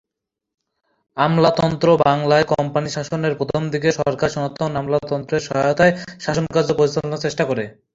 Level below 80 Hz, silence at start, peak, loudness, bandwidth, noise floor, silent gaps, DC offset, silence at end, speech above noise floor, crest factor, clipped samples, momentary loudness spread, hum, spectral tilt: -50 dBFS; 1.15 s; 0 dBFS; -19 LUFS; 7.8 kHz; -83 dBFS; none; under 0.1%; 0.25 s; 65 dB; 18 dB; under 0.1%; 8 LU; none; -6 dB/octave